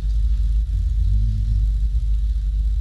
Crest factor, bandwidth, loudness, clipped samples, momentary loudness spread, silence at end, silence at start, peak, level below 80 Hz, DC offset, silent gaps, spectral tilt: 8 dB; 4.2 kHz; -23 LUFS; under 0.1%; 2 LU; 0 s; 0 s; -10 dBFS; -18 dBFS; under 0.1%; none; -7.5 dB/octave